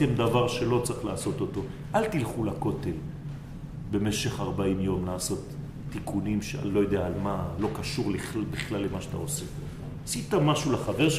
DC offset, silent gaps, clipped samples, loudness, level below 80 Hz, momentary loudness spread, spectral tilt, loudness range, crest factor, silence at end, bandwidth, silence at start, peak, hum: under 0.1%; none; under 0.1%; -29 LUFS; -46 dBFS; 13 LU; -5.5 dB/octave; 2 LU; 18 dB; 0 s; 15.5 kHz; 0 s; -12 dBFS; none